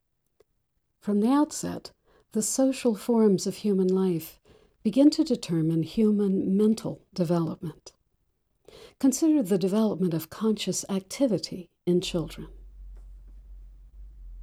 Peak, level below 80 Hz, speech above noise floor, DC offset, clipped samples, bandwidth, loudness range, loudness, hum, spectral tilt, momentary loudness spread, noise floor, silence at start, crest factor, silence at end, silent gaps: -10 dBFS; -52 dBFS; 50 dB; under 0.1%; under 0.1%; 16 kHz; 5 LU; -26 LUFS; none; -6 dB/octave; 13 LU; -75 dBFS; 1.05 s; 18 dB; 0 s; none